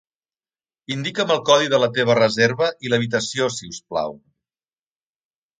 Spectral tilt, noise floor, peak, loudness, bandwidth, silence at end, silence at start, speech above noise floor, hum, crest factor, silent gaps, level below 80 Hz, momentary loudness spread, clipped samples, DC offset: -4 dB/octave; under -90 dBFS; 0 dBFS; -20 LUFS; 9.4 kHz; 1.45 s; 0.9 s; over 70 dB; none; 22 dB; none; -62 dBFS; 11 LU; under 0.1%; under 0.1%